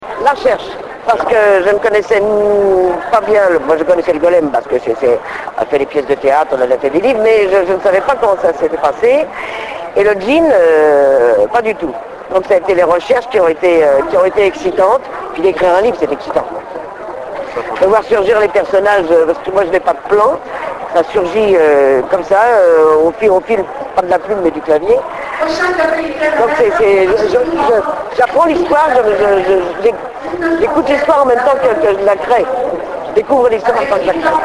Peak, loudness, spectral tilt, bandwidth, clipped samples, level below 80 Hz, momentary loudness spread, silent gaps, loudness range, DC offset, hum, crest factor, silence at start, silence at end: 0 dBFS; -12 LUFS; -5 dB/octave; 12 kHz; under 0.1%; -44 dBFS; 9 LU; none; 3 LU; under 0.1%; none; 12 dB; 0 s; 0 s